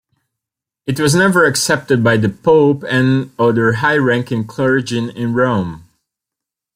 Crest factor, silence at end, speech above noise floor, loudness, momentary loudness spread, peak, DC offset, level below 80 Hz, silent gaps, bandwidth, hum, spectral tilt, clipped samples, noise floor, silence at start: 14 dB; 0.95 s; 70 dB; -14 LUFS; 9 LU; 0 dBFS; under 0.1%; -52 dBFS; none; 16 kHz; none; -5.5 dB/octave; under 0.1%; -84 dBFS; 0.85 s